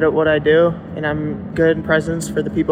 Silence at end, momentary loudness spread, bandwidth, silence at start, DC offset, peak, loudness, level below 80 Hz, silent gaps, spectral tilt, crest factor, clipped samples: 0 s; 9 LU; 15.5 kHz; 0 s; under 0.1%; -2 dBFS; -17 LUFS; -40 dBFS; none; -6 dB/octave; 14 dB; under 0.1%